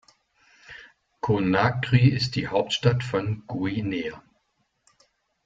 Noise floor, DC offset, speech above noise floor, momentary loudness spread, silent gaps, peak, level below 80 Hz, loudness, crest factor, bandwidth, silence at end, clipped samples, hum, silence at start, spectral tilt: -72 dBFS; under 0.1%; 49 dB; 20 LU; none; -6 dBFS; -54 dBFS; -24 LUFS; 20 dB; 7.6 kHz; 1.25 s; under 0.1%; none; 0.7 s; -6.5 dB/octave